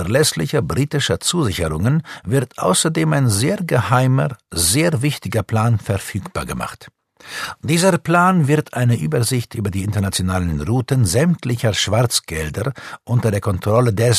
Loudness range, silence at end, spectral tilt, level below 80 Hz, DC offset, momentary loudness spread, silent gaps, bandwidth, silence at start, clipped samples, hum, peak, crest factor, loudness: 3 LU; 0 s; -5 dB/octave; -40 dBFS; under 0.1%; 9 LU; none; 14 kHz; 0 s; under 0.1%; none; 0 dBFS; 16 dB; -18 LUFS